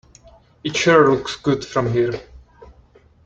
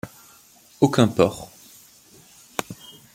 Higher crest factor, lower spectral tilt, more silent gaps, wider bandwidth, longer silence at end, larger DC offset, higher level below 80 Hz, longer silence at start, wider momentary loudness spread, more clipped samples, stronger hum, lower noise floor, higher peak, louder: second, 18 dB vs 24 dB; about the same, -5 dB/octave vs -6 dB/octave; neither; second, 9.2 kHz vs 17 kHz; first, 0.6 s vs 0.4 s; neither; first, -50 dBFS vs -58 dBFS; first, 0.65 s vs 0.05 s; second, 12 LU vs 22 LU; neither; neither; about the same, -51 dBFS vs -52 dBFS; about the same, -2 dBFS vs -2 dBFS; first, -18 LUFS vs -22 LUFS